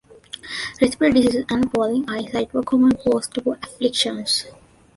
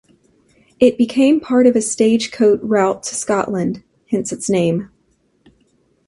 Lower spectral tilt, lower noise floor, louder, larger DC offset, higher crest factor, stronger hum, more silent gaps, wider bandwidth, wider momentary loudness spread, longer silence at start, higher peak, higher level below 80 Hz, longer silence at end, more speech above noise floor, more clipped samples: about the same, -4 dB/octave vs -5 dB/octave; second, -40 dBFS vs -61 dBFS; second, -20 LUFS vs -16 LUFS; neither; about the same, 18 dB vs 16 dB; neither; neither; about the same, 11.5 kHz vs 11.5 kHz; first, 12 LU vs 9 LU; second, 0.45 s vs 0.8 s; about the same, -2 dBFS vs 0 dBFS; first, -50 dBFS vs -56 dBFS; second, 0.45 s vs 1.2 s; second, 20 dB vs 46 dB; neither